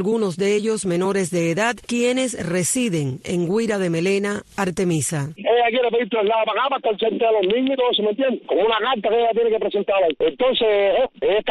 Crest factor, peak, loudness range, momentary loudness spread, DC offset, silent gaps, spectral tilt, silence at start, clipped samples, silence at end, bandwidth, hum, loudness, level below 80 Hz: 12 dB; -8 dBFS; 2 LU; 5 LU; under 0.1%; none; -4.5 dB/octave; 0 s; under 0.1%; 0 s; 12.5 kHz; none; -20 LUFS; -56 dBFS